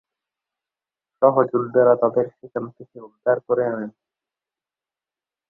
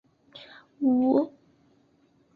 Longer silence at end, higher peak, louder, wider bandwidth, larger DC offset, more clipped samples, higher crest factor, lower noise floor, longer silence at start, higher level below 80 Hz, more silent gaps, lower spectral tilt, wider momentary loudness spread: first, 1.6 s vs 1.05 s; first, -2 dBFS vs -10 dBFS; first, -20 LUFS vs -25 LUFS; second, 2.2 kHz vs 4.7 kHz; neither; neither; about the same, 22 dB vs 18 dB; first, under -90 dBFS vs -64 dBFS; first, 1.2 s vs 0.35 s; about the same, -70 dBFS vs -72 dBFS; neither; first, -12 dB/octave vs -8.5 dB/octave; second, 14 LU vs 24 LU